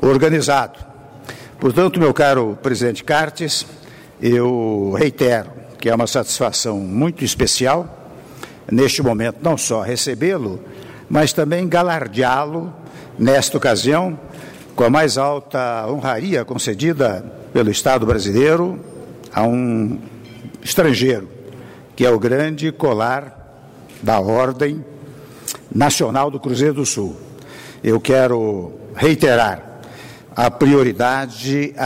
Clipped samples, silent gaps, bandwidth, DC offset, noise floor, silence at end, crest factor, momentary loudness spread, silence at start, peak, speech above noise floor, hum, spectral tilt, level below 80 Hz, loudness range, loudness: under 0.1%; none; 16 kHz; under 0.1%; -41 dBFS; 0 s; 14 dB; 21 LU; 0 s; -4 dBFS; 24 dB; none; -4.5 dB/octave; -46 dBFS; 2 LU; -17 LUFS